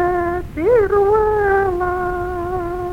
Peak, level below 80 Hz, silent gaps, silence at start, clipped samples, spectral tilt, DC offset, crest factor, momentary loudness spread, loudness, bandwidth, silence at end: -4 dBFS; -34 dBFS; none; 0 s; under 0.1%; -8 dB/octave; under 0.1%; 12 dB; 9 LU; -17 LUFS; 16 kHz; 0 s